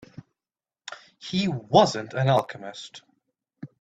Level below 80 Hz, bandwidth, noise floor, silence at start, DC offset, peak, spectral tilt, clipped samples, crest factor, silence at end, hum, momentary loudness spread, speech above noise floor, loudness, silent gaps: -64 dBFS; 10 kHz; under -90 dBFS; 0.9 s; under 0.1%; -2 dBFS; -5.5 dB/octave; under 0.1%; 24 dB; 0.15 s; none; 24 LU; over 67 dB; -23 LUFS; none